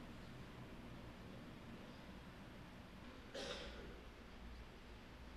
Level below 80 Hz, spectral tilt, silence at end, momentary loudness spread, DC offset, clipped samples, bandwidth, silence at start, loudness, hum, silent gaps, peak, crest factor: -60 dBFS; -5 dB/octave; 0 s; 8 LU; under 0.1%; under 0.1%; 13.5 kHz; 0 s; -55 LUFS; none; none; -34 dBFS; 20 dB